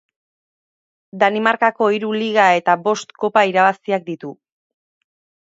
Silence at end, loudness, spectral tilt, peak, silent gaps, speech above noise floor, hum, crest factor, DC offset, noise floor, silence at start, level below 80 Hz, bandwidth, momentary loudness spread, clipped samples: 1.1 s; -17 LUFS; -4.5 dB/octave; 0 dBFS; none; over 73 dB; none; 18 dB; under 0.1%; under -90 dBFS; 1.15 s; -72 dBFS; 7.8 kHz; 9 LU; under 0.1%